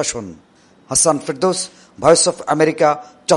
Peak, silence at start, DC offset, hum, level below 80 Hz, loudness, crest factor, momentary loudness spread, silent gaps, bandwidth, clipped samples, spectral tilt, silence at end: 0 dBFS; 0 s; under 0.1%; none; -52 dBFS; -16 LUFS; 18 dB; 13 LU; none; 11.5 kHz; under 0.1%; -3 dB/octave; 0 s